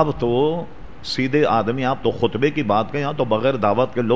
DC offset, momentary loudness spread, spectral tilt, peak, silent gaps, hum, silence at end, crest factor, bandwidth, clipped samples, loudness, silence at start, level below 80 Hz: 2%; 6 LU; -7 dB/octave; -2 dBFS; none; none; 0 s; 18 dB; 8 kHz; under 0.1%; -20 LUFS; 0 s; -46 dBFS